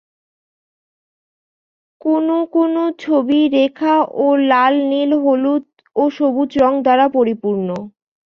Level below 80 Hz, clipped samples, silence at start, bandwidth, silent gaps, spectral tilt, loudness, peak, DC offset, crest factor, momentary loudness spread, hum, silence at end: -58 dBFS; under 0.1%; 2.05 s; 6.6 kHz; none; -7 dB/octave; -16 LUFS; -2 dBFS; under 0.1%; 14 dB; 7 LU; none; 0.4 s